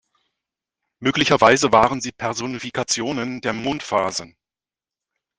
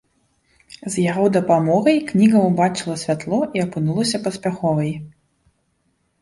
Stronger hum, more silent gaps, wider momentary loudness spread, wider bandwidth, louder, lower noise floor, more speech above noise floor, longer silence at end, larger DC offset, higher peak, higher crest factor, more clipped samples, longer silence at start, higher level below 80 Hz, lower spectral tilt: neither; neither; first, 12 LU vs 9 LU; second, 10 kHz vs 11.5 kHz; about the same, -20 LUFS vs -19 LUFS; first, under -90 dBFS vs -67 dBFS; first, over 70 dB vs 49 dB; about the same, 1.1 s vs 1.1 s; neither; first, 0 dBFS vs -4 dBFS; first, 22 dB vs 16 dB; neither; first, 1 s vs 0.85 s; about the same, -54 dBFS vs -58 dBFS; second, -3.5 dB/octave vs -6 dB/octave